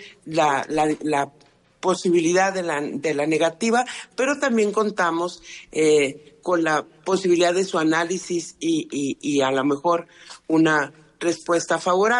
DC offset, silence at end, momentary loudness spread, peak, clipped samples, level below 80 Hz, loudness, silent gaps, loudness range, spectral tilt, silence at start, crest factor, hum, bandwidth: under 0.1%; 0 s; 9 LU; -8 dBFS; under 0.1%; -64 dBFS; -22 LUFS; none; 1 LU; -4 dB/octave; 0 s; 14 dB; none; 11.5 kHz